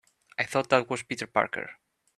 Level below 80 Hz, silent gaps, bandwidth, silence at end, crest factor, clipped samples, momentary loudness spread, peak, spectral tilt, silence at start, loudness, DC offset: -70 dBFS; none; 13 kHz; 0.45 s; 26 dB; under 0.1%; 13 LU; -4 dBFS; -4 dB/octave; 0.4 s; -28 LUFS; under 0.1%